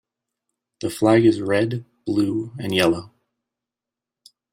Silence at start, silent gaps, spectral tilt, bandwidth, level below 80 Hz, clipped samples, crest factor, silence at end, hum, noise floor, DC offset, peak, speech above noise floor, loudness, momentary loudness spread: 0.8 s; none; -6 dB/octave; 16 kHz; -60 dBFS; under 0.1%; 18 dB; 1.45 s; none; -88 dBFS; under 0.1%; -4 dBFS; 68 dB; -21 LUFS; 13 LU